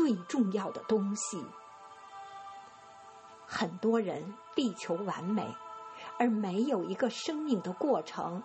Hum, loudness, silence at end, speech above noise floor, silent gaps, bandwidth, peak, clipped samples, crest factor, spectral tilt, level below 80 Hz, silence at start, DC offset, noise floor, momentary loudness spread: none; -33 LUFS; 0 s; 21 dB; none; 8.4 kHz; -14 dBFS; under 0.1%; 20 dB; -5 dB/octave; -80 dBFS; 0 s; under 0.1%; -53 dBFS; 20 LU